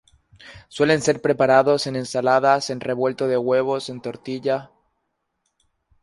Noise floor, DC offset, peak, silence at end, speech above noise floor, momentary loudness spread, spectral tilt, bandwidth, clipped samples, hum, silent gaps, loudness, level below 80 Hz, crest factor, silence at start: -75 dBFS; under 0.1%; -2 dBFS; 1.35 s; 55 dB; 11 LU; -5 dB/octave; 11.5 kHz; under 0.1%; none; none; -20 LUFS; -62 dBFS; 20 dB; 0.45 s